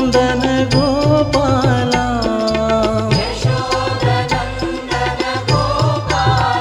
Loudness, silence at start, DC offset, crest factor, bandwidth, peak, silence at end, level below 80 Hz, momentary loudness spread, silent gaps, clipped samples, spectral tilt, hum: -16 LUFS; 0 s; under 0.1%; 14 dB; 12.5 kHz; 0 dBFS; 0 s; -30 dBFS; 5 LU; none; under 0.1%; -5.5 dB/octave; none